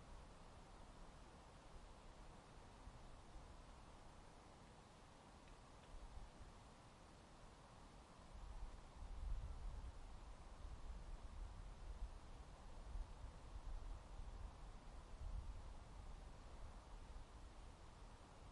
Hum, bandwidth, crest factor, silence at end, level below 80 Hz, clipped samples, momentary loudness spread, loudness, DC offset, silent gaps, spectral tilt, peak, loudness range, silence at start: none; 11 kHz; 18 dB; 0 s; -56 dBFS; under 0.1%; 8 LU; -61 LUFS; under 0.1%; none; -5.5 dB/octave; -36 dBFS; 6 LU; 0 s